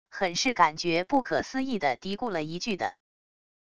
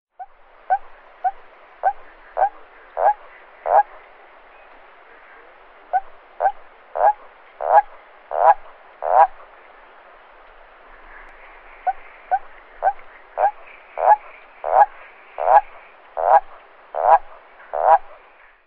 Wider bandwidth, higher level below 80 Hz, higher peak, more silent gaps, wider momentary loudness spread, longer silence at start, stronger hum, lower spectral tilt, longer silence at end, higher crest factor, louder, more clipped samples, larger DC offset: first, 11 kHz vs 4.1 kHz; second, -60 dBFS vs -52 dBFS; second, -8 dBFS vs 0 dBFS; neither; second, 8 LU vs 18 LU; second, 0.05 s vs 0.2 s; neither; first, -3.5 dB/octave vs 0 dB/octave; about the same, 0.7 s vs 0.6 s; about the same, 22 dB vs 22 dB; second, -28 LUFS vs -20 LUFS; neither; first, 0.4% vs 0.1%